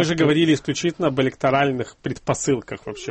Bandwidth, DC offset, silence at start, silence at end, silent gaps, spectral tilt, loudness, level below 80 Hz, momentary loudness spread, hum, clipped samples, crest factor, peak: 8.8 kHz; under 0.1%; 0 s; 0 s; none; -5 dB/octave; -21 LUFS; -52 dBFS; 11 LU; none; under 0.1%; 14 dB; -6 dBFS